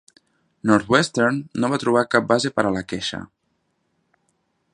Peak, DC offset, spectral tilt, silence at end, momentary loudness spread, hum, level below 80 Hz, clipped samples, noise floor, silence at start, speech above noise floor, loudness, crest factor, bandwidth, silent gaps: 0 dBFS; under 0.1%; -5 dB/octave; 1.5 s; 10 LU; none; -56 dBFS; under 0.1%; -71 dBFS; 0.65 s; 50 dB; -20 LUFS; 22 dB; 11.5 kHz; none